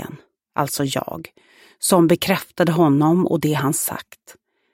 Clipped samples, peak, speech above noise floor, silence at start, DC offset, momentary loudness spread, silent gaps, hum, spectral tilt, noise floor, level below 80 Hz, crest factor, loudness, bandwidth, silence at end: under 0.1%; -2 dBFS; 22 dB; 0 s; under 0.1%; 15 LU; none; none; -5 dB/octave; -41 dBFS; -58 dBFS; 18 dB; -19 LUFS; 16.5 kHz; 0.4 s